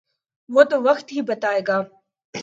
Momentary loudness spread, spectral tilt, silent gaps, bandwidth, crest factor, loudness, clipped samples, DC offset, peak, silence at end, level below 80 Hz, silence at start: 13 LU; -5 dB/octave; 2.25-2.33 s; 7.8 kHz; 20 dB; -20 LUFS; under 0.1%; under 0.1%; 0 dBFS; 0 s; -76 dBFS; 0.5 s